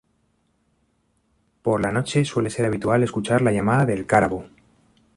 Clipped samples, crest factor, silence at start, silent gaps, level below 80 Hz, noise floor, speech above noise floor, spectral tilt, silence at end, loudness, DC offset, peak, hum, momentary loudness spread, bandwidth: under 0.1%; 20 dB; 1.65 s; none; -50 dBFS; -67 dBFS; 47 dB; -6.5 dB/octave; 0.7 s; -21 LUFS; under 0.1%; -4 dBFS; none; 5 LU; 11.5 kHz